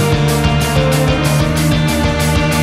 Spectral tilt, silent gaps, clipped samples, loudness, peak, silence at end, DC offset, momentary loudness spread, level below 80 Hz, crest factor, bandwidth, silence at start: -5.5 dB/octave; none; under 0.1%; -13 LUFS; -2 dBFS; 0 s; under 0.1%; 1 LU; -22 dBFS; 12 dB; 15.5 kHz; 0 s